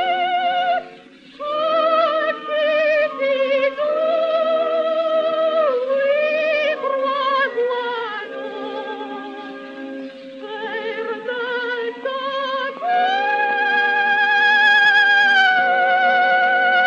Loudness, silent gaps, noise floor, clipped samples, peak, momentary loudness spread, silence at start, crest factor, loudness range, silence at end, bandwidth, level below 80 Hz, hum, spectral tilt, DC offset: -18 LUFS; none; -43 dBFS; under 0.1%; -4 dBFS; 16 LU; 0 s; 14 dB; 13 LU; 0 s; 7.4 kHz; -70 dBFS; none; -2.5 dB/octave; under 0.1%